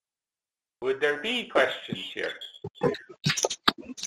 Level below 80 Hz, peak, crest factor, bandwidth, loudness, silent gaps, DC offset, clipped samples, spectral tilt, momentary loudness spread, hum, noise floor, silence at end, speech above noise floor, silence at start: -64 dBFS; -4 dBFS; 26 dB; 14 kHz; -28 LUFS; none; under 0.1%; under 0.1%; -3 dB/octave; 10 LU; none; under -90 dBFS; 0 s; over 61 dB; 0.8 s